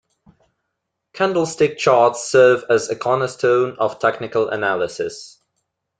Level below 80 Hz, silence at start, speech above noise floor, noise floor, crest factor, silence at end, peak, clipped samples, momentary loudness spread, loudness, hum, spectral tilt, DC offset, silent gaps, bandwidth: -62 dBFS; 1.15 s; 60 dB; -77 dBFS; 18 dB; 0.75 s; -2 dBFS; under 0.1%; 8 LU; -18 LUFS; none; -4.5 dB/octave; under 0.1%; none; 9.4 kHz